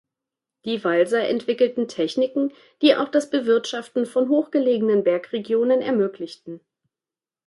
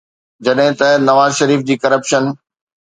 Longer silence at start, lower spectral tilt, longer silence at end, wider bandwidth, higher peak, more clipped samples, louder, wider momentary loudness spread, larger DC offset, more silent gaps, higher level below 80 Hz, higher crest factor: first, 0.65 s vs 0.4 s; about the same, -5 dB/octave vs -4.5 dB/octave; first, 0.9 s vs 0.5 s; first, 11.5 kHz vs 9.4 kHz; second, -4 dBFS vs 0 dBFS; neither; second, -21 LUFS vs -13 LUFS; about the same, 9 LU vs 9 LU; neither; neither; second, -74 dBFS vs -60 dBFS; about the same, 18 dB vs 14 dB